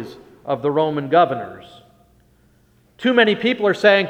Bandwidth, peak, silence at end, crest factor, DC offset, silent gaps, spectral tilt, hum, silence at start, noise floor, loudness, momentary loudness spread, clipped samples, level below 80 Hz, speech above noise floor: 10.5 kHz; 0 dBFS; 0 s; 18 dB; under 0.1%; none; -6 dB/octave; none; 0 s; -56 dBFS; -18 LUFS; 17 LU; under 0.1%; -62 dBFS; 39 dB